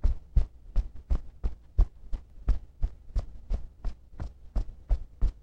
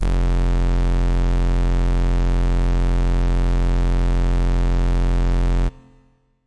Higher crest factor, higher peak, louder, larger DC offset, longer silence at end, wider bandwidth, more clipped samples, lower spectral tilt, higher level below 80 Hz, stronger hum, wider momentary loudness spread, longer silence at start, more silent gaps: first, 20 dB vs 2 dB; first, -10 dBFS vs -14 dBFS; second, -36 LUFS vs -21 LUFS; second, under 0.1% vs 1%; about the same, 0.1 s vs 0 s; second, 5.6 kHz vs 7.8 kHz; neither; about the same, -8.5 dB/octave vs -7.5 dB/octave; second, -30 dBFS vs -18 dBFS; neither; first, 12 LU vs 0 LU; about the same, 0.05 s vs 0 s; neither